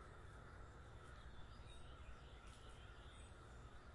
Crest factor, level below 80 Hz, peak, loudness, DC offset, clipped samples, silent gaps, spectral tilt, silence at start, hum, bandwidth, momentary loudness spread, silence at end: 14 dB; -62 dBFS; -44 dBFS; -61 LUFS; under 0.1%; under 0.1%; none; -5 dB/octave; 0 s; none; 11 kHz; 1 LU; 0 s